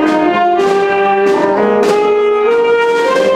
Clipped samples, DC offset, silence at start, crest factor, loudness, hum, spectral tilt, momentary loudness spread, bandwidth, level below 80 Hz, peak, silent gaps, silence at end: under 0.1%; under 0.1%; 0 s; 10 dB; -11 LUFS; none; -5 dB/octave; 1 LU; 12 kHz; -52 dBFS; 0 dBFS; none; 0 s